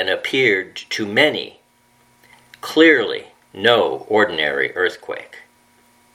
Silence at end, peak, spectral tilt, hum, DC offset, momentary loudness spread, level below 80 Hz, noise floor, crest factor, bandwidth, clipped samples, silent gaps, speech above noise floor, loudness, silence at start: 0.75 s; 0 dBFS; -4 dB/octave; none; under 0.1%; 18 LU; -66 dBFS; -57 dBFS; 20 dB; 16 kHz; under 0.1%; none; 39 dB; -17 LUFS; 0 s